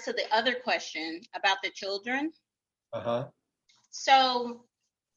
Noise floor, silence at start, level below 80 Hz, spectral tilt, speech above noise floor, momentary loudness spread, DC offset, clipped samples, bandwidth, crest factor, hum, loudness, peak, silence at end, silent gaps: -69 dBFS; 0 s; -82 dBFS; -2.5 dB/octave; 40 dB; 17 LU; under 0.1%; under 0.1%; 7.8 kHz; 22 dB; none; -29 LUFS; -10 dBFS; 0.6 s; none